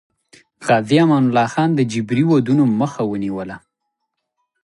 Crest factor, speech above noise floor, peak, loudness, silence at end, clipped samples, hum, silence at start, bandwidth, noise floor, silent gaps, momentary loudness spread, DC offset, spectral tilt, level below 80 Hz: 16 dB; 60 dB; -2 dBFS; -17 LUFS; 1.05 s; under 0.1%; none; 0.6 s; 11.5 kHz; -76 dBFS; none; 13 LU; under 0.1%; -7 dB/octave; -58 dBFS